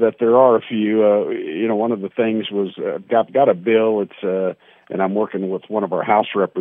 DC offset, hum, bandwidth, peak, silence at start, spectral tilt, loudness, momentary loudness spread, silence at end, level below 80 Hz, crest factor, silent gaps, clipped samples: under 0.1%; none; 3.8 kHz; -2 dBFS; 0 s; -10 dB/octave; -18 LUFS; 8 LU; 0 s; -74 dBFS; 16 dB; none; under 0.1%